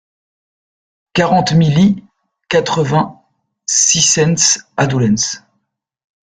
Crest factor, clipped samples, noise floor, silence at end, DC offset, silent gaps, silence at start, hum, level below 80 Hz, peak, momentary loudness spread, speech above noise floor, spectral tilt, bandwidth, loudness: 16 dB; under 0.1%; -70 dBFS; 0.85 s; under 0.1%; none; 1.15 s; none; -50 dBFS; 0 dBFS; 10 LU; 57 dB; -3.5 dB/octave; 10 kHz; -13 LUFS